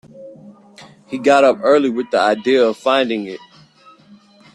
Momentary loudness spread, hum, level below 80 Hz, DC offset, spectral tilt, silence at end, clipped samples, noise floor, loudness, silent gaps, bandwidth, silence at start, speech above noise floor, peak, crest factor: 15 LU; none; -66 dBFS; under 0.1%; -4.5 dB/octave; 1.2 s; under 0.1%; -47 dBFS; -15 LUFS; none; 11 kHz; 0.15 s; 33 dB; -2 dBFS; 16 dB